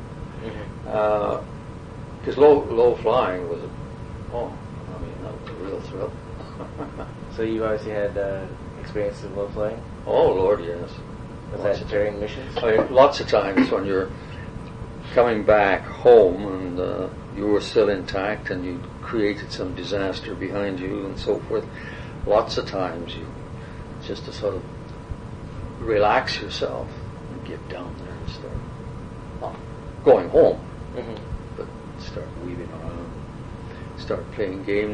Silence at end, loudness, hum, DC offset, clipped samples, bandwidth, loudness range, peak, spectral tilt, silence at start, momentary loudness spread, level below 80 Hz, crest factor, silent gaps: 0 s; -23 LUFS; none; under 0.1%; under 0.1%; 9.8 kHz; 12 LU; -2 dBFS; -6.5 dB/octave; 0 s; 19 LU; -42 dBFS; 22 dB; none